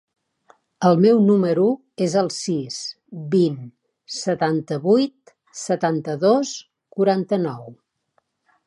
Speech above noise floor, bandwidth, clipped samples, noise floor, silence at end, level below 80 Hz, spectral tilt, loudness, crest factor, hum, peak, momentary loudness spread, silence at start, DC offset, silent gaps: 49 dB; 11.5 kHz; under 0.1%; -69 dBFS; 0.95 s; -72 dBFS; -6 dB/octave; -20 LUFS; 18 dB; none; -4 dBFS; 17 LU; 0.8 s; under 0.1%; none